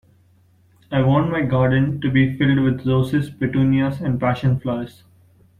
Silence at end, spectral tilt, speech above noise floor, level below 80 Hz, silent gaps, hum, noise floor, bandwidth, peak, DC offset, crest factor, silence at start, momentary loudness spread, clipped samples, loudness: 0.7 s; -9 dB/octave; 37 dB; -46 dBFS; none; none; -55 dBFS; 4.5 kHz; -4 dBFS; under 0.1%; 16 dB; 0.9 s; 6 LU; under 0.1%; -19 LUFS